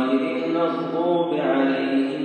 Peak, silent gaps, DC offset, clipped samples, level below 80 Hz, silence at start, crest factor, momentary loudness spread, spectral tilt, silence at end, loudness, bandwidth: -8 dBFS; none; under 0.1%; under 0.1%; -82 dBFS; 0 s; 14 dB; 3 LU; -7.5 dB/octave; 0 s; -22 LUFS; 8.6 kHz